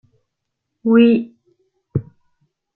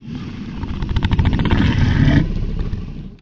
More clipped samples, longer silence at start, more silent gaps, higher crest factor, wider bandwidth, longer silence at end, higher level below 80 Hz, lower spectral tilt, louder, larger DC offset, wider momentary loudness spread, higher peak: neither; first, 0.85 s vs 0 s; neither; about the same, 18 dB vs 18 dB; second, 4.3 kHz vs 7 kHz; first, 0.75 s vs 0.05 s; second, -56 dBFS vs -22 dBFS; first, -11 dB/octave vs -8 dB/octave; about the same, -17 LUFS vs -19 LUFS; neither; about the same, 14 LU vs 14 LU; about the same, -2 dBFS vs 0 dBFS